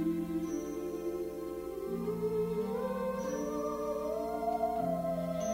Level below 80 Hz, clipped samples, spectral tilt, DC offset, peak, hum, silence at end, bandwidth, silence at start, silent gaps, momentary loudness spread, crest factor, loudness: -58 dBFS; under 0.1%; -6.5 dB/octave; under 0.1%; -22 dBFS; none; 0 s; 16 kHz; 0 s; none; 5 LU; 14 dB; -36 LUFS